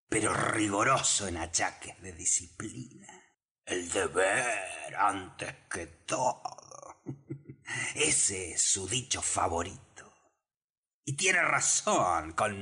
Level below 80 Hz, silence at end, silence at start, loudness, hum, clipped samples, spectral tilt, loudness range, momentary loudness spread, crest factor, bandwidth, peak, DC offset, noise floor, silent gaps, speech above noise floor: -60 dBFS; 0 s; 0.1 s; -29 LUFS; none; under 0.1%; -2 dB/octave; 4 LU; 20 LU; 16 dB; 13 kHz; -16 dBFS; under 0.1%; under -90 dBFS; 3.51-3.55 s, 10.57-10.83 s, 10.94-11.03 s; over 59 dB